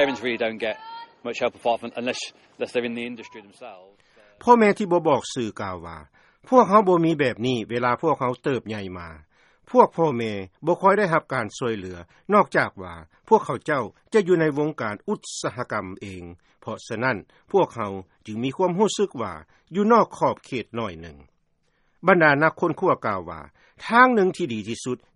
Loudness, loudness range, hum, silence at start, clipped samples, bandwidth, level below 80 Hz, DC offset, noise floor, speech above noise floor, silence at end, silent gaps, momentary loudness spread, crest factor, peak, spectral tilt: -22 LUFS; 7 LU; none; 0 s; under 0.1%; 11.5 kHz; -60 dBFS; under 0.1%; -67 dBFS; 44 dB; 0.2 s; none; 20 LU; 22 dB; 0 dBFS; -5.5 dB/octave